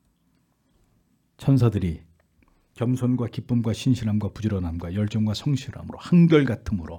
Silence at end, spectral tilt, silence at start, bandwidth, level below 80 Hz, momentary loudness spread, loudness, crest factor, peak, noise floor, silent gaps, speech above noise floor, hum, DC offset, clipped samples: 0 s; -8 dB/octave; 1.4 s; 11.5 kHz; -48 dBFS; 11 LU; -23 LUFS; 18 dB; -4 dBFS; -67 dBFS; none; 44 dB; none; under 0.1%; under 0.1%